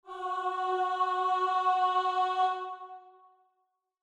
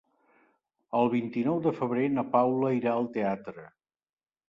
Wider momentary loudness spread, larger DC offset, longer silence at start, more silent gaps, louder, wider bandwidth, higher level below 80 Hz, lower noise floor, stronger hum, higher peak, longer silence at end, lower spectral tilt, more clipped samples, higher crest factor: first, 11 LU vs 8 LU; neither; second, 0.05 s vs 0.9 s; neither; about the same, -29 LUFS vs -28 LUFS; first, 9.4 kHz vs 5.8 kHz; second, -84 dBFS vs -72 dBFS; first, -79 dBFS vs -70 dBFS; neither; second, -16 dBFS vs -10 dBFS; about the same, 0.9 s vs 0.85 s; second, -1.5 dB/octave vs -9.5 dB/octave; neither; second, 14 dB vs 20 dB